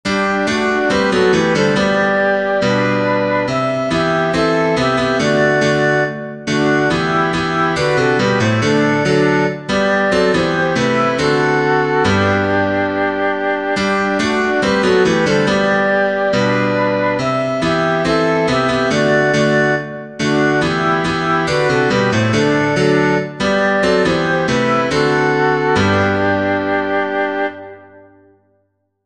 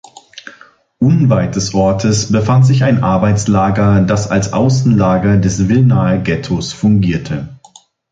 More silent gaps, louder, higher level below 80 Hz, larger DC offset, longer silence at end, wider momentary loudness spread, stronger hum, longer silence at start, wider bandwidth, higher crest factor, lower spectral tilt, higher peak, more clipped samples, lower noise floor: neither; second, -15 LUFS vs -12 LUFS; second, -44 dBFS vs -34 dBFS; first, 0.3% vs under 0.1%; first, 1.05 s vs 0.55 s; second, 4 LU vs 9 LU; neither; second, 0.05 s vs 0.35 s; first, 10.5 kHz vs 9.2 kHz; about the same, 14 dB vs 12 dB; about the same, -5.5 dB/octave vs -6.5 dB/octave; about the same, 0 dBFS vs -2 dBFS; neither; first, -64 dBFS vs -44 dBFS